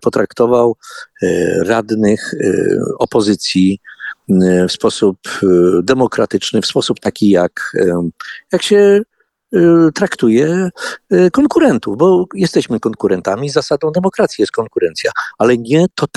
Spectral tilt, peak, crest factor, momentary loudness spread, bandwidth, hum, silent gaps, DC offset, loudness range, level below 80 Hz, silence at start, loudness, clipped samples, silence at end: -5.5 dB/octave; 0 dBFS; 12 dB; 8 LU; 12.5 kHz; none; none; under 0.1%; 3 LU; -50 dBFS; 0 s; -13 LUFS; under 0.1%; 0.1 s